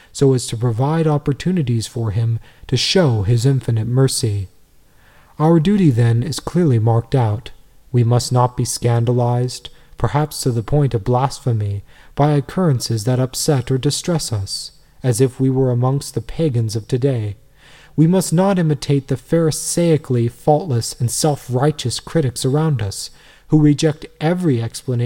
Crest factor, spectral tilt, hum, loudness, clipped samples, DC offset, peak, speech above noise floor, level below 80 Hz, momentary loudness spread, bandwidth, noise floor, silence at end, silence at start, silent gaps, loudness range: 16 dB; -6 dB/octave; none; -18 LUFS; under 0.1%; 0.2%; -2 dBFS; 33 dB; -42 dBFS; 8 LU; 16.5 kHz; -50 dBFS; 0 s; 0.15 s; none; 2 LU